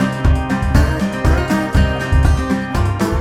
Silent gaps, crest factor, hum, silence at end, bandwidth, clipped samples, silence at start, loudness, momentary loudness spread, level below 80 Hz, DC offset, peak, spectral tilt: none; 14 dB; none; 0 s; 15 kHz; under 0.1%; 0 s; -16 LUFS; 3 LU; -18 dBFS; under 0.1%; 0 dBFS; -6.5 dB/octave